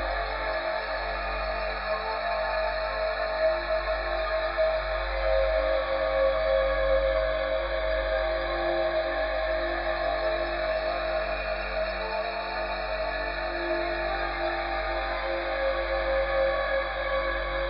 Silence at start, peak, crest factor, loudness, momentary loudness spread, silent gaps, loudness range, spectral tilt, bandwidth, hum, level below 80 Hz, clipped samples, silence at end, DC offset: 0 s; -14 dBFS; 14 dB; -28 LUFS; 5 LU; none; 4 LU; -2 dB/octave; 5.4 kHz; none; -38 dBFS; under 0.1%; 0 s; under 0.1%